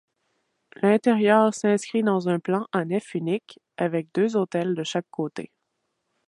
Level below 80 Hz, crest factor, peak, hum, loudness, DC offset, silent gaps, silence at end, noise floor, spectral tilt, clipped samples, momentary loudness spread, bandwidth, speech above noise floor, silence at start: -74 dBFS; 20 dB; -6 dBFS; none; -24 LUFS; under 0.1%; none; 0.85 s; -77 dBFS; -6 dB/octave; under 0.1%; 12 LU; 11.5 kHz; 54 dB; 0.8 s